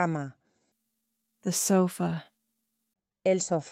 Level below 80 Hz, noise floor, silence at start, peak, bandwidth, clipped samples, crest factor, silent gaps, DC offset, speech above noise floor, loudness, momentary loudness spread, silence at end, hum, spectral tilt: -74 dBFS; -80 dBFS; 0 s; -12 dBFS; 16.5 kHz; under 0.1%; 18 dB; none; under 0.1%; 53 dB; -28 LUFS; 13 LU; 0 s; none; -5 dB/octave